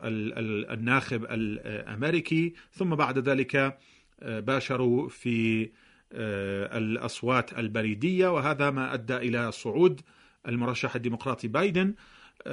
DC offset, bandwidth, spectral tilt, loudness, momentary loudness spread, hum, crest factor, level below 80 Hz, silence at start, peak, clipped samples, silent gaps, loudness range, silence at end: under 0.1%; 10.5 kHz; -6.5 dB/octave; -28 LUFS; 9 LU; none; 20 dB; -62 dBFS; 0 s; -10 dBFS; under 0.1%; none; 2 LU; 0 s